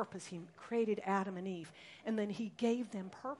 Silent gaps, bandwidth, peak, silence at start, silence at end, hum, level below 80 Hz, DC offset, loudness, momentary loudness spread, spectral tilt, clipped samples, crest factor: none; 11.5 kHz; -22 dBFS; 0 s; 0 s; none; -84 dBFS; under 0.1%; -39 LUFS; 12 LU; -6 dB/octave; under 0.1%; 18 dB